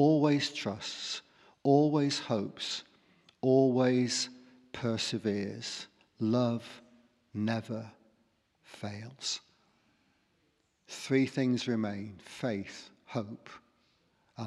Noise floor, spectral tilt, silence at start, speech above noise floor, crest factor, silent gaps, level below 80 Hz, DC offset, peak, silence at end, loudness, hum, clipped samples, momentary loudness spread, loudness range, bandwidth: -74 dBFS; -5.5 dB/octave; 0 s; 43 dB; 20 dB; none; -78 dBFS; under 0.1%; -12 dBFS; 0 s; -32 LUFS; none; under 0.1%; 18 LU; 10 LU; 12 kHz